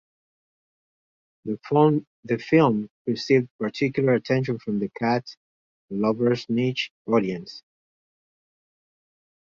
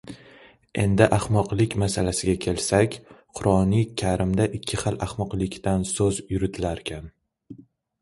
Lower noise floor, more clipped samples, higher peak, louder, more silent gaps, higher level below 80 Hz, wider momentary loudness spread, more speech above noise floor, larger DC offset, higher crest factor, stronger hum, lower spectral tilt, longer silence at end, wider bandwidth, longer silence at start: first, under -90 dBFS vs -52 dBFS; neither; about the same, -4 dBFS vs -4 dBFS; about the same, -24 LUFS vs -24 LUFS; first, 2.07-2.23 s, 2.90-3.05 s, 3.51-3.59 s, 5.37-5.88 s, 6.90-7.05 s vs none; second, -66 dBFS vs -42 dBFS; about the same, 13 LU vs 13 LU; first, over 67 dB vs 29 dB; neither; about the same, 20 dB vs 20 dB; neither; first, -7.5 dB/octave vs -5.5 dB/octave; first, 1.95 s vs 0.4 s; second, 7.4 kHz vs 11.5 kHz; first, 1.45 s vs 0.05 s